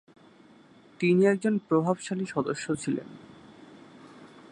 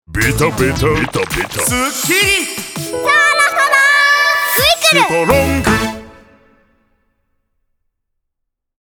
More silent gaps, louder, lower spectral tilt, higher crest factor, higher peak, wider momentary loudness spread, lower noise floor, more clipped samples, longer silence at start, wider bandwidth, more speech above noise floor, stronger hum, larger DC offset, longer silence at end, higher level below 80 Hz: neither; second, -27 LUFS vs -12 LUFS; first, -6.5 dB/octave vs -3 dB/octave; about the same, 18 dB vs 14 dB; second, -10 dBFS vs 0 dBFS; about the same, 11 LU vs 9 LU; second, -55 dBFS vs -75 dBFS; neither; first, 1 s vs 0.1 s; second, 10.5 kHz vs over 20 kHz; second, 29 dB vs 61 dB; neither; neither; second, 0.25 s vs 2.85 s; second, -70 dBFS vs -34 dBFS